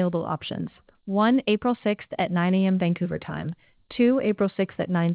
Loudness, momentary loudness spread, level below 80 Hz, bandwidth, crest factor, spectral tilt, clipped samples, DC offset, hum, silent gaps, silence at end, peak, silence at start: -25 LUFS; 13 LU; -58 dBFS; 4 kHz; 14 dB; -11 dB/octave; under 0.1%; under 0.1%; none; none; 0 s; -10 dBFS; 0 s